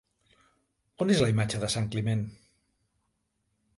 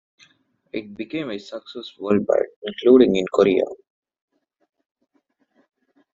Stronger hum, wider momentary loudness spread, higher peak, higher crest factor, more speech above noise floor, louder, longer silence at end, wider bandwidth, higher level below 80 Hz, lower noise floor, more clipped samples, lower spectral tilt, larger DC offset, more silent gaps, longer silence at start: neither; second, 8 LU vs 19 LU; second, -12 dBFS vs -2 dBFS; about the same, 20 dB vs 20 dB; about the same, 50 dB vs 47 dB; second, -28 LUFS vs -20 LUFS; second, 1.45 s vs 2.4 s; first, 11.5 kHz vs 7.6 kHz; about the same, -58 dBFS vs -62 dBFS; first, -77 dBFS vs -66 dBFS; neither; about the same, -5.5 dB/octave vs -5 dB/octave; neither; second, none vs 2.56-2.62 s; first, 1 s vs 0.75 s